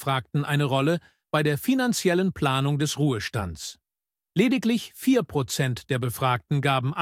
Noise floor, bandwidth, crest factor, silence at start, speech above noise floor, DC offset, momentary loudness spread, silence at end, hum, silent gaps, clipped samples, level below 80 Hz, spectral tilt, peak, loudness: under -90 dBFS; 16.5 kHz; 16 dB; 0 s; over 66 dB; under 0.1%; 7 LU; 0 s; none; none; under 0.1%; -56 dBFS; -5.5 dB/octave; -8 dBFS; -25 LUFS